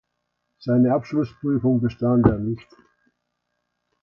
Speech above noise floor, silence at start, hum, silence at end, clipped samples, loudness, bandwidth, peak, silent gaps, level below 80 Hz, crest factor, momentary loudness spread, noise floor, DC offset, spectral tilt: 56 dB; 0.6 s; none; 1.45 s; under 0.1%; -21 LUFS; 5.8 kHz; 0 dBFS; none; -44 dBFS; 22 dB; 11 LU; -77 dBFS; under 0.1%; -10.5 dB/octave